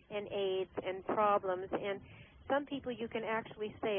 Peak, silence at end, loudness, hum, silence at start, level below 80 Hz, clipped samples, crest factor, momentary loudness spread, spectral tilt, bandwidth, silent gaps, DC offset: -18 dBFS; 0 s; -37 LUFS; none; 0.1 s; -66 dBFS; under 0.1%; 18 dB; 11 LU; -1 dB/octave; 3.6 kHz; none; under 0.1%